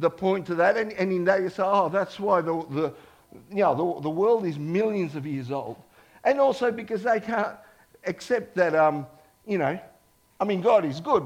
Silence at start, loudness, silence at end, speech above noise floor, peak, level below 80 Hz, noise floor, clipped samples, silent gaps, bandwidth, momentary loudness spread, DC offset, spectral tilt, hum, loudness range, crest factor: 0 s; -25 LUFS; 0 s; 36 dB; -8 dBFS; -66 dBFS; -60 dBFS; under 0.1%; none; 15.5 kHz; 11 LU; under 0.1%; -7 dB/octave; none; 2 LU; 18 dB